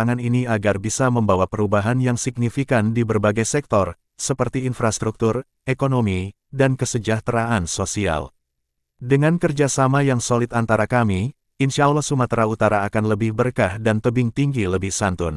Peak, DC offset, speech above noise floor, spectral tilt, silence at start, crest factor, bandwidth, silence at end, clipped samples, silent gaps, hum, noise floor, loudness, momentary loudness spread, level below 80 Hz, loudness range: -2 dBFS; under 0.1%; 57 dB; -5.5 dB/octave; 0 s; 18 dB; 12 kHz; 0 s; under 0.1%; none; none; -76 dBFS; -20 LUFS; 5 LU; -46 dBFS; 3 LU